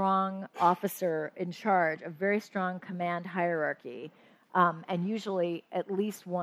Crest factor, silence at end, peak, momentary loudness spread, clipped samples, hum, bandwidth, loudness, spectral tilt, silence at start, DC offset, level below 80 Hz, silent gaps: 20 dB; 0 s; -10 dBFS; 8 LU; under 0.1%; none; 15.5 kHz; -31 LUFS; -6.5 dB/octave; 0 s; under 0.1%; -86 dBFS; none